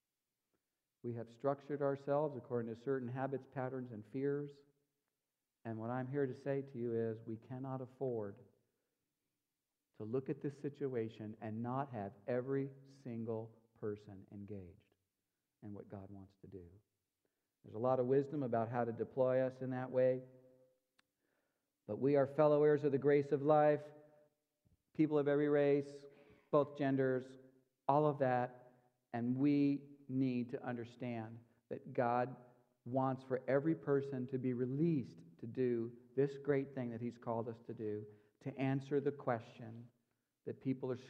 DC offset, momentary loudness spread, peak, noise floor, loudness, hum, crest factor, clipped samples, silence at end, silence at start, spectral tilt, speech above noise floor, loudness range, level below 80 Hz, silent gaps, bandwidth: under 0.1%; 19 LU; -18 dBFS; under -90 dBFS; -39 LUFS; none; 22 dB; under 0.1%; 0 s; 1.05 s; -9.5 dB/octave; over 52 dB; 11 LU; -84 dBFS; none; 7.4 kHz